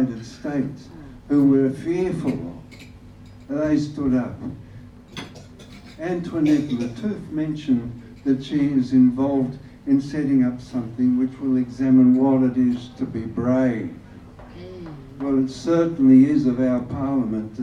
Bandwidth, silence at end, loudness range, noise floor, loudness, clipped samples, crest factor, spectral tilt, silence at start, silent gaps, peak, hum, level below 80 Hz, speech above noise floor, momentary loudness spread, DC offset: 7.4 kHz; 0 s; 7 LU; -43 dBFS; -21 LUFS; under 0.1%; 16 dB; -8 dB/octave; 0 s; none; -4 dBFS; none; -50 dBFS; 23 dB; 20 LU; under 0.1%